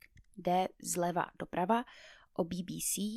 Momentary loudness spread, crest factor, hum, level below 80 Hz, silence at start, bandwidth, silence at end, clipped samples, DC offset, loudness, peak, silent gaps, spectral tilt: 10 LU; 20 dB; none; -66 dBFS; 0.35 s; 16 kHz; 0 s; under 0.1%; under 0.1%; -35 LUFS; -16 dBFS; none; -4 dB/octave